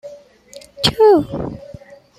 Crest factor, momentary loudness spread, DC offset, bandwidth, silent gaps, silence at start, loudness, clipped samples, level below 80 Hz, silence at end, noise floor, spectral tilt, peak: 18 dB; 17 LU; under 0.1%; 14 kHz; none; 0.05 s; -15 LUFS; under 0.1%; -44 dBFS; 0.45 s; -42 dBFS; -5 dB/octave; 0 dBFS